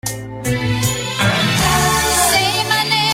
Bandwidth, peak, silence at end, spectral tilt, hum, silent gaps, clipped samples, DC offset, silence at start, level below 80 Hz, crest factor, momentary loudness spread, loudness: 16.5 kHz; -2 dBFS; 0 s; -3 dB/octave; none; none; under 0.1%; under 0.1%; 0.05 s; -36 dBFS; 14 dB; 8 LU; -15 LUFS